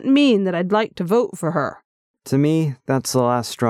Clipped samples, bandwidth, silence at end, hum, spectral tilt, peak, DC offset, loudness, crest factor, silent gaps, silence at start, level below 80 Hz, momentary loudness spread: under 0.1%; 14.5 kHz; 0 s; none; -6 dB/octave; -6 dBFS; under 0.1%; -19 LUFS; 14 dB; 1.85-2.14 s; 0 s; -64 dBFS; 7 LU